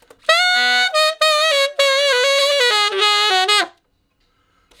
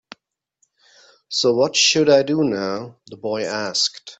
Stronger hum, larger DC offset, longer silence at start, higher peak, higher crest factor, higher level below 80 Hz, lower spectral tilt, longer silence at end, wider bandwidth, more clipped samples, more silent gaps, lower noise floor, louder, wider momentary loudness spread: neither; neither; second, 0.3 s vs 1.3 s; about the same, 0 dBFS vs 0 dBFS; about the same, 16 dB vs 20 dB; second, -70 dBFS vs -64 dBFS; second, 2.5 dB/octave vs -3 dB/octave; first, 1.1 s vs 0.05 s; first, 19 kHz vs 8.4 kHz; neither; neither; second, -64 dBFS vs -68 dBFS; first, -14 LUFS vs -18 LUFS; second, 2 LU vs 14 LU